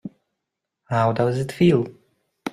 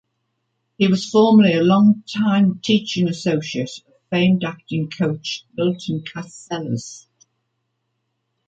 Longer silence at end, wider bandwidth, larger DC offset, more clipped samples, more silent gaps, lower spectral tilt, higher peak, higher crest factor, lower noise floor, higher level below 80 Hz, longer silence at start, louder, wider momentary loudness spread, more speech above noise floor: second, 0 s vs 1.5 s; first, 13.5 kHz vs 8 kHz; neither; neither; neither; about the same, -7.5 dB/octave vs -6.5 dB/octave; second, -6 dBFS vs -2 dBFS; about the same, 18 dB vs 16 dB; first, -82 dBFS vs -73 dBFS; first, -56 dBFS vs -62 dBFS; second, 0.05 s vs 0.8 s; about the same, -21 LUFS vs -19 LUFS; about the same, 16 LU vs 15 LU; first, 63 dB vs 55 dB